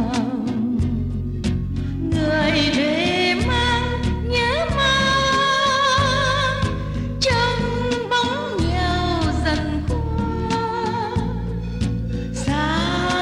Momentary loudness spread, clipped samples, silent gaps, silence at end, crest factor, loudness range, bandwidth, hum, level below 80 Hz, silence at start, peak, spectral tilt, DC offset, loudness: 8 LU; under 0.1%; none; 0 s; 14 dB; 5 LU; 11.5 kHz; none; -30 dBFS; 0 s; -6 dBFS; -5 dB/octave; under 0.1%; -20 LUFS